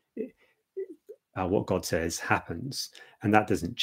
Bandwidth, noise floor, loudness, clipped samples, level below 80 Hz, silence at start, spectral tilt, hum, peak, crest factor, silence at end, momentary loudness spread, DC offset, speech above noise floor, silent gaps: 16 kHz; -59 dBFS; -29 LUFS; under 0.1%; -56 dBFS; 0.15 s; -4.5 dB/octave; none; -4 dBFS; 26 dB; 0 s; 16 LU; under 0.1%; 30 dB; none